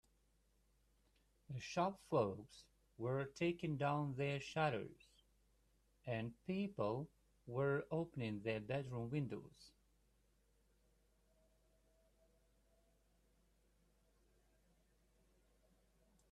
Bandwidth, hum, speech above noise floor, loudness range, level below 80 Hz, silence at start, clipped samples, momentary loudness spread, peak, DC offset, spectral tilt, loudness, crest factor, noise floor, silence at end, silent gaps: 12.5 kHz; none; 35 dB; 6 LU; -74 dBFS; 1.5 s; under 0.1%; 13 LU; -24 dBFS; under 0.1%; -7 dB/octave; -43 LUFS; 22 dB; -78 dBFS; 6.65 s; none